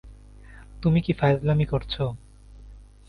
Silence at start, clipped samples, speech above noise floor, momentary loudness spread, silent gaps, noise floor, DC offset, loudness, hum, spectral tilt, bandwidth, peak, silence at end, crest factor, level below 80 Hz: 0.05 s; under 0.1%; 23 dB; 8 LU; none; -46 dBFS; under 0.1%; -24 LUFS; none; -9 dB/octave; 5.2 kHz; -8 dBFS; 0.25 s; 18 dB; -42 dBFS